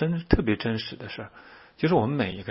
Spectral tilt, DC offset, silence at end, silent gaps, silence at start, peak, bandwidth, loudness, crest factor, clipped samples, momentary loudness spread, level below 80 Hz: -11 dB/octave; under 0.1%; 0 s; none; 0 s; -4 dBFS; 5.8 kHz; -26 LUFS; 22 dB; under 0.1%; 14 LU; -40 dBFS